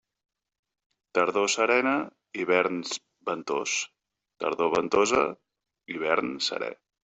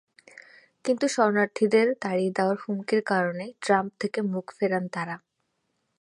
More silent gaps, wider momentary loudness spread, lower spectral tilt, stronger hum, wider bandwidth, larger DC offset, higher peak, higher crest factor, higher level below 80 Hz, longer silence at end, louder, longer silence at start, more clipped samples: neither; about the same, 12 LU vs 10 LU; second, -2.5 dB/octave vs -5.5 dB/octave; neither; second, 8.2 kHz vs 11.5 kHz; neither; about the same, -8 dBFS vs -8 dBFS; about the same, 20 dB vs 20 dB; first, -66 dBFS vs -76 dBFS; second, 0.3 s vs 0.85 s; about the same, -27 LUFS vs -26 LUFS; first, 1.15 s vs 0.85 s; neither